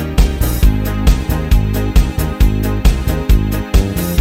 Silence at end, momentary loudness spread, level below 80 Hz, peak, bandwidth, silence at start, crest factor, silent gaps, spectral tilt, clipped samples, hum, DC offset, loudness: 0 s; 1 LU; -14 dBFS; 0 dBFS; 16.5 kHz; 0 s; 12 dB; none; -6 dB/octave; under 0.1%; none; under 0.1%; -15 LUFS